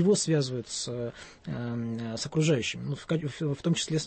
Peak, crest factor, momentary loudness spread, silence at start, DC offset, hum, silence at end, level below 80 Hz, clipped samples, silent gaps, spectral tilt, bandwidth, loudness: -14 dBFS; 16 dB; 11 LU; 0 s; under 0.1%; none; 0 s; -60 dBFS; under 0.1%; none; -5 dB/octave; 8.8 kHz; -30 LUFS